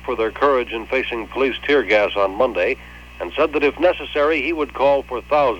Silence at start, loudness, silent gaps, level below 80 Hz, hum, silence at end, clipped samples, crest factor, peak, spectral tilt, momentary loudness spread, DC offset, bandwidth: 0 s; -19 LUFS; none; -42 dBFS; 60 Hz at -40 dBFS; 0 s; under 0.1%; 14 dB; -4 dBFS; -5.5 dB/octave; 6 LU; 0.1%; 17 kHz